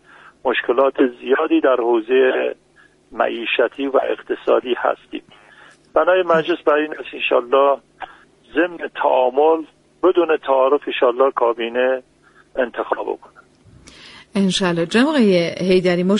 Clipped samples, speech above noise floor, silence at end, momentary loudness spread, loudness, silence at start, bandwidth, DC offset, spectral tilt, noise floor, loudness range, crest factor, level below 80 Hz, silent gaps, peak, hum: under 0.1%; 36 dB; 0 s; 10 LU; -18 LUFS; 0.45 s; 11.5 kHz; under 0.1%; -5.5 dB/octave; -53 dBFS; 4 LU; 16 dB; -58 dBFS; none; -2 dBFS; none